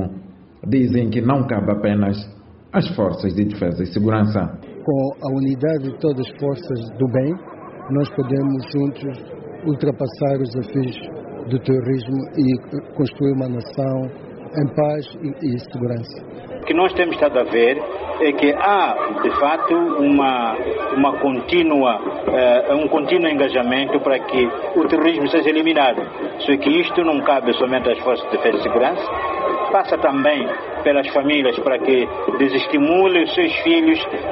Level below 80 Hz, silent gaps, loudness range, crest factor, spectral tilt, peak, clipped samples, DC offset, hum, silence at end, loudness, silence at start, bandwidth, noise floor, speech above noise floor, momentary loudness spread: -50 dBFS; none; 5 LU; 16 dB; -5 dB/octave; -2 dBFS; under 0.1%; under 0.1%; none; 0 s; -18 LUFS; 0 s; 5.8 kHz; -39 dBFS; 21 dB; 10 LU